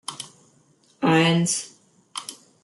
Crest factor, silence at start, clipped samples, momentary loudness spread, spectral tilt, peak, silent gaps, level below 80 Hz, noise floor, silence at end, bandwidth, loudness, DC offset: 18 dB; 0.1 s; under 0.1%; 21 LU; -4 dB/octave; -8 dBFS; none; -68 dBFS; -60 dBFS; 0.3 s; 12 kHz; -21 LUFS; under 0.1%